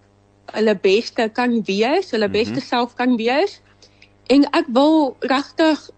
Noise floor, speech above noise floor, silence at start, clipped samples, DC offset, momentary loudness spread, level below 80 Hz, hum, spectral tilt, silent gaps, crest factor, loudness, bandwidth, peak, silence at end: -51 dBFS; 33 dB; 0.55 s; under 0.1%; under 0.1%; 6 LU; -58 dBFS; 50 Hz at -55 dBFS; -5 dB/octave; none; 12 dB; -18 LUFS; 8.8 kHz; -6 dBFS; 0.2 s